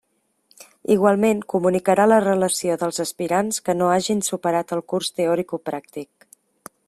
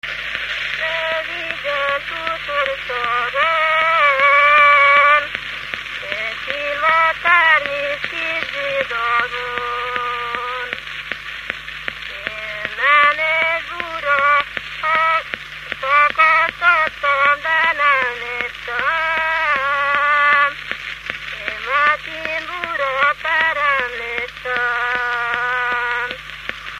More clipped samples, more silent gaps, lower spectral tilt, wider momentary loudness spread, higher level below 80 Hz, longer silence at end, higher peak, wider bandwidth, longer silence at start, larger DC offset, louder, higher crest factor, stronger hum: neither; neither; first, -4.5 dB/octave vs -2 dB/octave; about the same, 13 LU vs 13 LU; second, -64 dBFS vs -50 dBFS; first, 0.85 s vs 0 s; second, -4 dBFS vs 0 dBFS; about the same, 14.5 kHz vs 15 kHz; first, 0.9 s vs 0.05 s; neither; second, -20 LUFS vs -17 LUFS; about the same, 18 dB vs 18 dB; neither